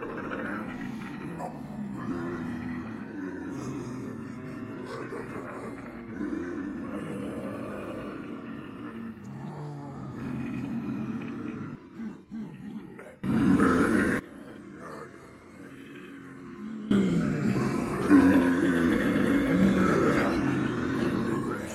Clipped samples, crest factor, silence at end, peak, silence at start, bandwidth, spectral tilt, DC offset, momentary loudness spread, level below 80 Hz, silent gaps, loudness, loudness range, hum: under 0.1%; 20 dB; 0 s; -8 dBFS; 0 s; 13.5 kHz; -7 dB/octave; under 0.1%; 19 LU; -54 dBFS; none; -29 LUFS; 14 LU; none